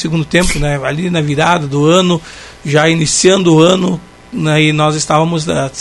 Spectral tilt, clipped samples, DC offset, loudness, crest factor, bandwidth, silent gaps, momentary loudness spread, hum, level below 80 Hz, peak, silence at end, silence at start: -4.5 dB/octave; 0.2%; under 0.1%; -12 LUFS; 12 dB; 12 kHz; none; 10 LU; none; -32 dBFS; 0 dBFS; 0 s; 0 s